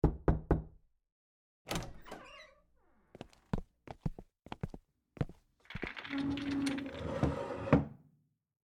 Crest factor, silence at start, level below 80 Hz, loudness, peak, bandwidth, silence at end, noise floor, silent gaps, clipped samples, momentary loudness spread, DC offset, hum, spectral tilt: 28 dB; 0.05 s; -46 dBFS; -38 LUFS; -10 dBFS; 19 kHz; 0.7 s; -74 dBFS; 1.12-1.65 s; under 0.1%; 23 LU; under 0.1%; none; -7 dB/octave